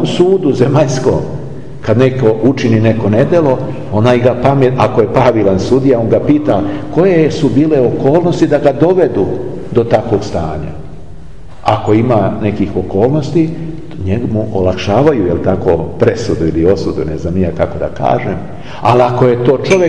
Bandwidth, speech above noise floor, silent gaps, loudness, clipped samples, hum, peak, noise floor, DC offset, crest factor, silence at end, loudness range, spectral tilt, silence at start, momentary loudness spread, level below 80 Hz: 10.5 kHz; 22 dB; none; -12 LUFS; under 0.1%; none; 0 dBFS; -33 dBFS; 5%; 12 dB; 0 s; 4 LU; -7.5 dB/octave; 0 s; 8 LU; -36 dBFS